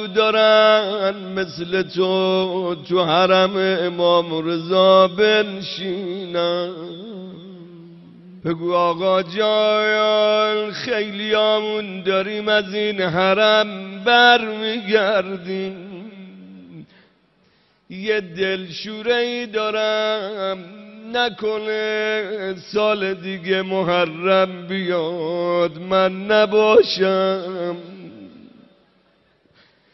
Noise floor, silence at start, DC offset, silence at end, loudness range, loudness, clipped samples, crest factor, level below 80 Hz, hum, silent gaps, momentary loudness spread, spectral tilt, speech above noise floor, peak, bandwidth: -59 dBFS; 0 s; under 0.1%; 1.65 s; 8 LU; -19 LUFS; under 0.1%; 18 dB; -64 dBFS; none; none; 14 LU; -2 dB/octave; 41 dB; -2 dBFS; 6.2 kHz